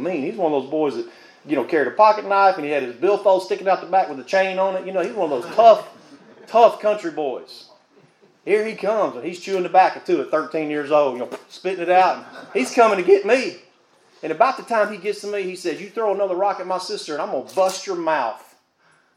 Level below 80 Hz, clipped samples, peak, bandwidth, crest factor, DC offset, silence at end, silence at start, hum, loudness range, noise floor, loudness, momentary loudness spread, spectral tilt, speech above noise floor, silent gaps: -86 dBFS; under 0.1%; 0 dBFS; 15 kHz; 20 dB; under 0.1%; 0.8 s; 0 s; none; 5 LU; -59 dBFS; -20 LUFS; 12 LU; -4.5 dB/octave; 40 dB; none